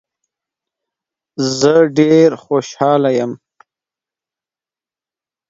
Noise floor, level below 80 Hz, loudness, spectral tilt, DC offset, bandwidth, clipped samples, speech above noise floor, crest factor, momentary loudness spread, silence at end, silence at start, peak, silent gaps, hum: under -90 dBFS; -62 dBFS; -13 LUFS; -5.5 dB/octave; under 0.1%; 7.8 kHz; under 0.1%; over 77 dB; 16 dB; 13 LU; 2.15 s; 1.4 s; 0 dBFS; none; none